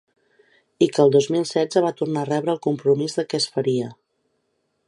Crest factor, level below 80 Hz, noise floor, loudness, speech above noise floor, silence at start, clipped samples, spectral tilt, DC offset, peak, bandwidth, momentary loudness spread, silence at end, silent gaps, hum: 18 dB; -72 dBFS; -71 dBFS; -21 LUFS; 51 dB; 0.8 s; under 0.1%; -5.5 dB/octave; under 0.1%; -4 dBFS; 11.5 kHz; 7 LU; 0.95 s; none; none